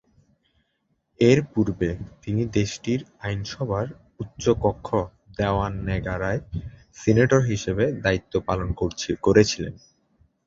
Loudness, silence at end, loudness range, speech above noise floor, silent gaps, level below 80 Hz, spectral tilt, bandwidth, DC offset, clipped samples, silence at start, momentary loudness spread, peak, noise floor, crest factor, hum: -24 LUFS; 0.7 s; 4 LU; 49 dB; none; -42 dBFS; -6 dB/octave; 7.8 kHz; under 0.1%; under 0.1%; 1.2 s; 13 LU; -2 dBFS; -72 dBFS; 22 dB; none